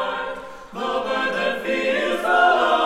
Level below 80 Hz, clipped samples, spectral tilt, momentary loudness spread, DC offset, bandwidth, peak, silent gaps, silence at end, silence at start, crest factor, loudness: -54 dBFS; under 0.1%; -3.5 dB/octave; 14 LU; under 0.1%; 15.5 kHz; -4 dBFS; none; 0 s; 0 s; 16 dB; -21 LUFS